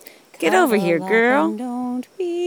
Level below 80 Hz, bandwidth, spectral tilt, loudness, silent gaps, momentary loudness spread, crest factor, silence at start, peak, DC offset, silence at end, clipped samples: -78 dBFS; 19.5 kHz; -5 dB/octave; -19 LUFS; none; 10 LU; 16 dB; 0.4 s; -4 dBFS; under 0.1%; 0 s; under 0.1%